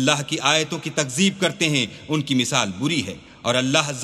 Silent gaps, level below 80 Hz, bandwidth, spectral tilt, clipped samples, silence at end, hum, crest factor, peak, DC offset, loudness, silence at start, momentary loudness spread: none; -58 dBFS; 15 kHz; -3.5 dB/octave; under 0.1%; 0 s; none; 22 dB; 0 dBFS; under 0.1%; -21 LUFS; 0 s; 6 LU